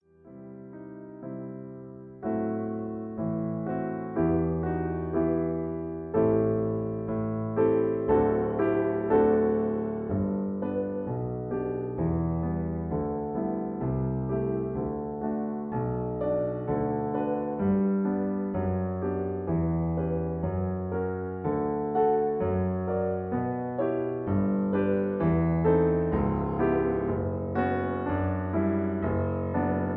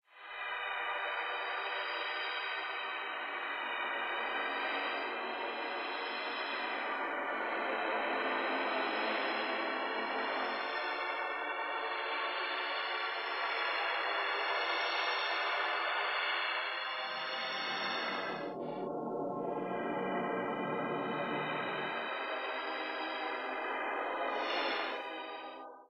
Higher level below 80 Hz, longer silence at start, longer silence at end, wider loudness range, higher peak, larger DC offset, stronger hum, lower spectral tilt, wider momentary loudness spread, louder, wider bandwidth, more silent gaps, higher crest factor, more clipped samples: first, -46 dBFS vs -82 dBFS; about the same, 0.25 s vs 0.15 s; about the same, 0 s vs 0.05 s; about the same, 5 LU vs 4 LU; first, -12 dBFS vs -20 dBFS; neither; neither; first, -13 dB/octave vs -4.5 dB/octave; first, 8 LU vs 5 LU; first, -28 LUFS vs -36 LUFS; second, 3.8 kHz vs 15.5 kHz; neither; about the same, 16 dB vs 16 dB; neither